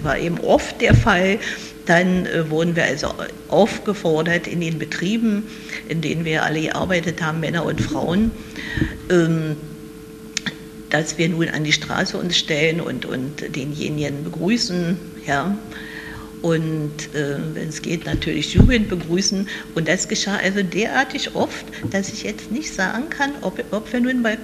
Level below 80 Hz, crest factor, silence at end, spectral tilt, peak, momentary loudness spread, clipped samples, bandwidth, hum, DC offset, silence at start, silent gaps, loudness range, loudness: -36 dBFS; 20 dB; 0 s; -5 dB/octave; -2 dBFS; 10 LU; under 0.1%; 14 kHz; none; under 0.1%; 0 s; none; 4 LU; -21 LUFS